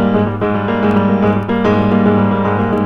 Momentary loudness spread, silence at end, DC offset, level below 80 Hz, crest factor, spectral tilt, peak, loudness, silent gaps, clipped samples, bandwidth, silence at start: 3 LU; 0 s; under 0.1%; -38 dBFS; 12 dB; -9.5 dB/octave; 0 dBFS; -14 LUFS; none; under 0.1%; 6.2 kHz; 0 s